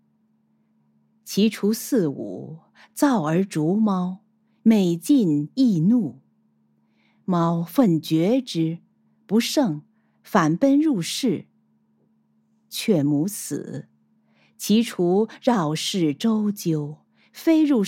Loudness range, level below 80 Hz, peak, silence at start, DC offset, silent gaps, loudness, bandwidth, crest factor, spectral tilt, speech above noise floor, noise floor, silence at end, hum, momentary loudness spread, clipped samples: 4 LU; -76 dBFS; -4 dBFS; 1.25 s; under 0.1%; none; -22 LUFS; 17 kHz; 20 dB; -6 dB/octave; 44 dB; -65 dBFS; 0 s; none; 14 LU; under 0.1%